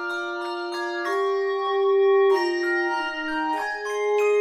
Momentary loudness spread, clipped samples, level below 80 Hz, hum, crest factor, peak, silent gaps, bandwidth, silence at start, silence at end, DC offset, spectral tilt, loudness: 10 LU; under 0.1%; -64 dBFS; none; 12 dB; -12 dBFS; none; 12 kHz; 0 s; 0 s; under 0.1%; -2 dB/octave; -23 LUFS